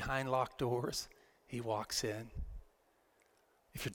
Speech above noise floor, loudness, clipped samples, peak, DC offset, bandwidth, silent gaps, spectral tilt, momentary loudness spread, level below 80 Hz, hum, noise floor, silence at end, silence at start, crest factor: 35 dB; -39 LUFS; under 0.1%; -20 dBFS; under 0.1%; 17 kHz; none; -4 dB/octave; 16 LU; -54 dBFS; none; -73 dBFS; 0 s; 0 s; 20 dB